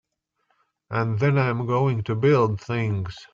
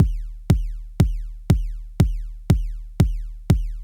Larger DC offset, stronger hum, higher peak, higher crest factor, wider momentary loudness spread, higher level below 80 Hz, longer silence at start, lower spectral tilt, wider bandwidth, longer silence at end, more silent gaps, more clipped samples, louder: neither; neither; second, -8 dBFS vs 0 dBFS; second, 16 dB vs 22 dB; second, 8 LU vs 12 LU; second, -58 dBFS vs -26 dBFS; first, 0.9 s vs 0 s; about the same, -8.5 dB/octave vs -7.5 dB/octave; second, 7.4 kHz vs 17 kHz; about the same, 0.05 s vs 0 s; neither; neither; about the same, -23 LUFS vs -23 LUFS